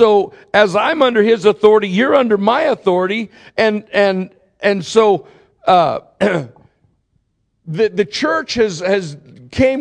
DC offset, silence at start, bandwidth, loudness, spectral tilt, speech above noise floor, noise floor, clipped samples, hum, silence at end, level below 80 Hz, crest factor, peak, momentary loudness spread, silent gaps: under 0.1%; 0 s; 10 kHz; -15 LUFS; -5.5 dB/octave; 50 dB; -64 dBFS; under 0.1%; none; 0 s; -50 dBFS; 14 dB; 0 dBFS; 10 LU; none